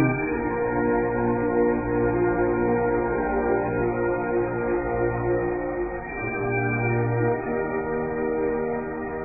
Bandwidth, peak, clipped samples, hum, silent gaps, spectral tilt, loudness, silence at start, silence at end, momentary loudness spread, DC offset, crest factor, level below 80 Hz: 2.6 kHz; -8 dBFS; under 0.1%; none; none; -15 dB/octave; -25 LUFS; 0 s; 0 s; 5 LU; under 0.1%; 16 dB; -42 dBFS